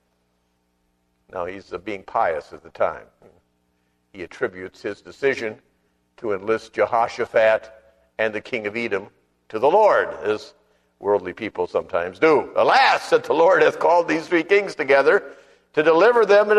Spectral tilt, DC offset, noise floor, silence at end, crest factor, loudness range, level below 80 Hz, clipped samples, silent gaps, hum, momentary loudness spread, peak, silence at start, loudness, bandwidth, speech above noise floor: -4.5 dB/octave; under 0.1%; -68 dBFS; 0 s; 18 dB; 11 LU; -62 dBFS; under 0.1%; none; 60 Hz at -65 dBFS; 16 LU; -2 dBFS; 1.35 s; -20 LUFS; 11 kHz; 49 dB